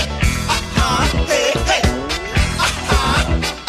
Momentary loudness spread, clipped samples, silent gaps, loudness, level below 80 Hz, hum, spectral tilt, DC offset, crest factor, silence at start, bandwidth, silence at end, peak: 3 LU; under 0.1%; none; -17 LUFS; -22 dBFS; none; -4 dB/octave; under 0.1%; 16 dB; 0 s; 15.5 kHz; 0 s; -2 dBFS